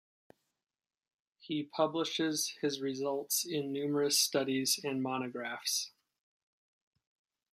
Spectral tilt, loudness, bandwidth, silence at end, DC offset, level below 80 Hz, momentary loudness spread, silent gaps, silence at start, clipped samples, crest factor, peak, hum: -2.5 dB/octave; -33 LUFS; 15.5 kHz; 1.65 s; under 0.1%; -86 dBFS; 9 LU; none; 1.45 s; under 0.1%; 20 dB; -16 dBFS; none